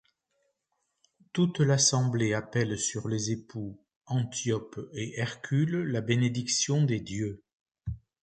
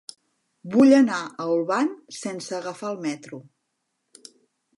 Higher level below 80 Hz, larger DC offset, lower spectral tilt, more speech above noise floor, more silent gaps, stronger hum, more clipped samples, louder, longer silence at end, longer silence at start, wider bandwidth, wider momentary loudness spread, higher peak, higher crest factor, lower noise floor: first, -56 dBFS vs -78 dBFS; neither; about the same, -4.5 dB/octave vs -5 dB/octave; second, 51 dB vs 55 dB; first, 3.96-4.01 s, 7.53-7.66 s vs none; neither; neither; second, -29 LUFS vs -23 LUFS; second, 0.25 s vs 1.35 s; first, 1.35 s vs 0.65 s; second, 9.4 kHz vs 11.5 kHz; second, 16 LU vs 25 LU; second, -12 dBFS vs -6 dBFS; about the same, 18 dB vs 20 dB; about the same, -80 dBFS vs -77 dBFS